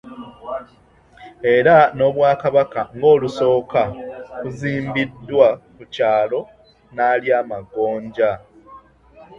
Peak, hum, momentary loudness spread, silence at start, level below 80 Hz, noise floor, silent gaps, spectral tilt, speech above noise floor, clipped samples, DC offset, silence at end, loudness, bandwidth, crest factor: 0 dBFS; none; 16 LU; 0.05 s; -54 dBFS; -51 dBFS; none; -7 dB/octave; 34 dB; under 0.1%; under 0.1%; 0.15 s; -18 LUFS; 7.6 kHz; 18 dB